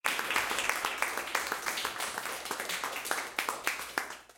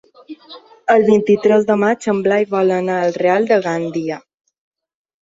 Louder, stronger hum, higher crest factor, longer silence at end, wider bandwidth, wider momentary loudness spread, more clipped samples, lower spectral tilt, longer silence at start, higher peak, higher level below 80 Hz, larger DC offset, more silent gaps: second, -33 LUFS vs -16 LUFS; neither; first, 24 dB vs 16 dB; second, 0.05 s vs 1.05 s; first, 17 kHz vs 7.8 kHz; second, 6 LU vs 13 LU; neither; second, 0 dB/octave vs -6.5 dB/octave; second, 0.05 s vs 0.3 s; second, -10 dBFS vs -2 dBFS; second, -68 dBFS vs -62 dBFS; neither; neither